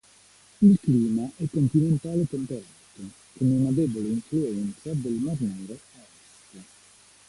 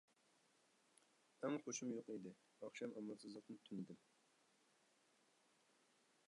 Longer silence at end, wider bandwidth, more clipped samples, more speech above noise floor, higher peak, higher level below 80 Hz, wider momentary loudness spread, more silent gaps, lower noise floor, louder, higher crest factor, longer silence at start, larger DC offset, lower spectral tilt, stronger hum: second, 0.65 s vs 2.3 s; about the same, 11.5 kHz vs 11 kHz; neither; about the same, 31 dB vs 28 dB; first, -8 dBFS vs -32 dBFS; first, -58 dBFS vs under -90 dBFS; first, 20 LU vs 11 LU; neither; second, -56 dBFS vs -79 dBFS; first, -25 LUFS vs -51 LUFS; about the same, 18 dB vs 22 dB; second, 0.6 s vs 1.4 s; neither; first, -8.5 dB/octave vs -4.5 dB/octave; first, 50 Hz at -50 dBFS vs none